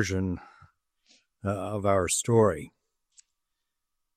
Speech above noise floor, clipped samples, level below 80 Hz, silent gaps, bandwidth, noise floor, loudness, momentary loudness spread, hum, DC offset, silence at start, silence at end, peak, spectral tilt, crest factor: 58 dB; under 0.1%; -60 dBFS; none; 14.5 kHz; -84 dBFS; -27 LUFS; 15 LU; none; under 0.1%; 0 s; 1.5 s; -8 dBFS; -5 dB/octave; 22 dB